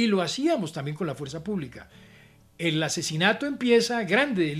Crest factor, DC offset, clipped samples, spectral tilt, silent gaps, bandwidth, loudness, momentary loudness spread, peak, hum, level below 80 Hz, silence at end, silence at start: 20 dB; under 0.1%; under 0.1%; -4.5 dB/octave; none; 14.5 kHz; -25 LUFS; 10 LU; -6 dBFS; none; -62 dBFS; 0 s; 0 s